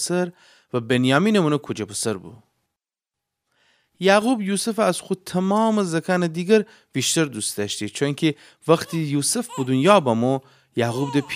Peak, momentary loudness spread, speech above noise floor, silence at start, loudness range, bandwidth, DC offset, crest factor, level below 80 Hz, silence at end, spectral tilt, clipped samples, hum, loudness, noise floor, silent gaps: -2 dBFS; 10 LU; 66 dB; 0 s; 3 LU; 16 kHz; under 0.1%; 20 dB; -68 dBFS; 0 s; -4.5 dB/octave; under 0.1%; none; -21 LUFS; -87 dBFS; none